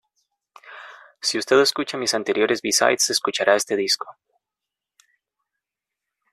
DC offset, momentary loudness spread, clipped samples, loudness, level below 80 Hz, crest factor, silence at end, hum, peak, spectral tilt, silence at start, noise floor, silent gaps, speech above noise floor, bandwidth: under 0.1%; 16 LU; under 0.1%; -20 LUFS; -68 dBFS; 22 dB; 2.2 s; none; -2 dBFS; -1.5 dB/octave; 0.65 s; -86 dBFS; none; 66 dB; 13.5 kHz